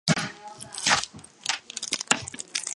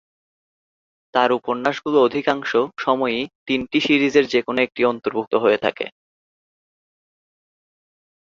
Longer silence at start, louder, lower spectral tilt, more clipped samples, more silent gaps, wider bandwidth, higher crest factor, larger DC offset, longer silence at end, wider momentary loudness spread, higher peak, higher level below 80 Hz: second, 0.05 s vs 1.15 s; second, -27 LUFS vs -20 LUFS; second, -2 dB/octave vs -5 dB/octave; neither; second, none vs 3.35-3.46 s, 5.27-5.31 s; first, 12 kHz vs 7.6 kHz; first, 26 dB vs 20 dB; neither; second, 0.05 s vs 2.5 s; first, 14 LU vs 7 LU; about the same, -2 dBFS vs -2 dBFS; about the same, -60 dBFS vs -62 dBFS